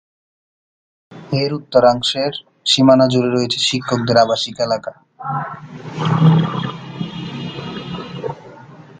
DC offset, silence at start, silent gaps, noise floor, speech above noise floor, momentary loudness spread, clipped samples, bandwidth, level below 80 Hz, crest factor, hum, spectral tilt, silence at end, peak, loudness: under 0.1%; 1.1 s; none; -39 dBFS; 24 dB; 16 LU; under 0.1%; 9.4 kHz; -54 dBFS; 18 dB; none; -5.5 dB/octave; 0.2 s; 0 dBFS; -17 LUFS